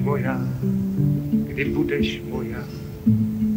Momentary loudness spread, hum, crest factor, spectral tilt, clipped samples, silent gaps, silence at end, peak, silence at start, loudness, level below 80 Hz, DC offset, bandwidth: 8 LU; none; 14 dB; -8 dB/octave; under 0.1%; none; 0 s; -8 dBFS; 0 s; -23 LUFS; -42 dBFS; under 0.1%; 16 kHz